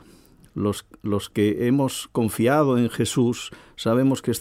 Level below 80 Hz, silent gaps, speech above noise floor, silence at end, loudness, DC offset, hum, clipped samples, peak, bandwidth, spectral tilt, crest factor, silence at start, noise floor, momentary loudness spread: -56 dBFS; none; 30 dB; 0 s; -23 LUFS; under 0.1%; none; under 0.1%; -8 dBFS; 16 kHz; -6 dB/octave; 14 dB; 0.55 s; -52 dBFS; 10 LU